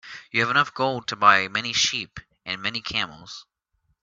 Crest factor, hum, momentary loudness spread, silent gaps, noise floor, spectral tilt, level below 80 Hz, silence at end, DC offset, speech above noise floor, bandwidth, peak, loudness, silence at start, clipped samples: 24 dB; none; 21 LU; none; -72 dBFS; -2 dB/octave; -60 dBFS; 0.6 s; under 0.1%; 48 dB; 7.8 kHz; -2 dBFS; -22 LUFS; 0.05 s; under 0.1%